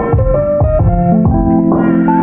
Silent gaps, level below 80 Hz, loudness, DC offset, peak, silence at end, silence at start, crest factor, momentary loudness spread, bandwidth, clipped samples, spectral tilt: none; -20 dBFS; -11 LUFS; under 0.1%; 0 dBFS; 0 s; 0 s; 10 dB; 2 LU; 3 kHz; under 0.1%; -13.5 dB/octave